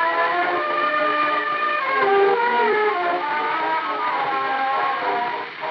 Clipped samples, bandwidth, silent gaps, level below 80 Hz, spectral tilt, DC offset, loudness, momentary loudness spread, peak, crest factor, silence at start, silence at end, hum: under 0.1%; 6.2 kHz; none; -86 dBFS; -5 dB/octave; under 0.1%; -20 LUFS; 5 LU; -6 dBFS; 14 dB; 0 s; 0 s; none